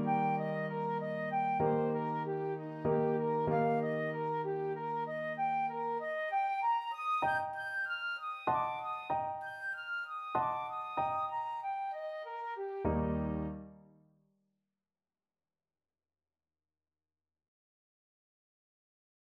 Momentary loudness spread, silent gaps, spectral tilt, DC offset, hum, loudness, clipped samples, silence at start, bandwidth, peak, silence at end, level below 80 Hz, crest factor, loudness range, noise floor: 8 LU; none; -8 dB/octave; under 0.1%; none; -35 LUFS; under 0.1%; 0 s; 12 kHz; -18 dBFS; 5.55 s; -58 dBFS; 18 dB; 6 LU; under -90 dBFS